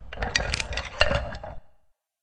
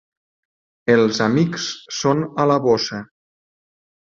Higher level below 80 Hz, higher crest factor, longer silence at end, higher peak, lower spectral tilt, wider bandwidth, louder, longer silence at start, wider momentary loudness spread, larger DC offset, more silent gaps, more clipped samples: first, -36 dBFS vs -60 dBFS; first, 30 dB vs 18 dB; second, 0.55 s vs 1 s; about the same, 0 dBFS vs -2 dBFS; second, -3 dB/octave vs -5 dB/octave; first, 10.5 kHz vs 7.6 kHz; second, -27 LUFS vs -19 LUFS; second, 0 s vs 0.85 s; first, 15 LU vs 10 LU; neither; neither; neither